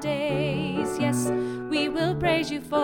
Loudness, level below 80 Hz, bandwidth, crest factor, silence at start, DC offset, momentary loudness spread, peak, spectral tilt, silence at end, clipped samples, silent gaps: -26 LUFS; -50 dBFS; 18.5 kHz; 16 dB; 0 s; under 0.1%; 3 LU; -10 dBFS; -5.5 dB/octave; 0 s; under 0.1%; none